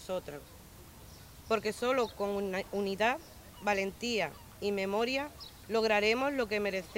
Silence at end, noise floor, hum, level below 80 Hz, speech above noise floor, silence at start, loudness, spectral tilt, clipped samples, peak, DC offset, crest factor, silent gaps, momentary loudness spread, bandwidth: 0 s; -52 dBFS; none; -60 dBFS; 20 dB; 0 s; -33 LUFS; -4 dB/octave; under 0.1%; -16 dBFS; under 0.1%; 18 dB; none; 22 LU; 16 kHz